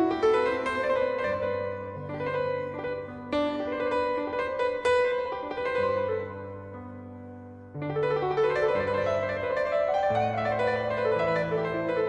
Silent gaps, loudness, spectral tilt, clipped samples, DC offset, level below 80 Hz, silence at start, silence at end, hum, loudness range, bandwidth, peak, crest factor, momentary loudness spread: none; -28 LUFS; -6.5 dB/octave; under 0.1%; under 0.1%; -58 dBFS; 0 s; 0 s; none; 4 LU; 9.8 kHz; -12 dBFS; 16 dB; 13 LU